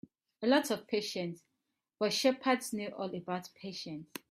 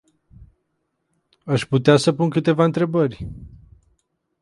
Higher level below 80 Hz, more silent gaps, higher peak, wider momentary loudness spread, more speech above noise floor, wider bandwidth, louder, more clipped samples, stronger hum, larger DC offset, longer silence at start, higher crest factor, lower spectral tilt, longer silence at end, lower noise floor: second, -78 dBFS vs -48 dBFS; neither; second, -14 dBFS vs -2 dBFS; second, 14 LU vs 19 LU; second, 51 dB vs 55 dB; first, 15.5 kHz vs 11.5 kHz; second, -34 LUFS vs -19 LUFS; neither; neither; neither; second, 0.4 s vs 1.45 s; about the same, 20 dB vs 20 dB; second, -4 dB/octave vs -6.5 dB/octave; second, 0.15 s vs 0.95 s; first, -85 dBFS vs -73 dBFS